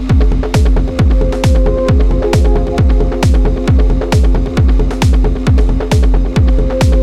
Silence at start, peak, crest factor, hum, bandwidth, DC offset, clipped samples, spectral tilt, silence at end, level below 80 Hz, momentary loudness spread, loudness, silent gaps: 0 s; 0 dBFS; 10 dB; none; 11.5 kHz; under 0.1%; under 0.1%; -7 dB/octave; 0 s; -12 dBFS; 1 LU; -12 LUFS; none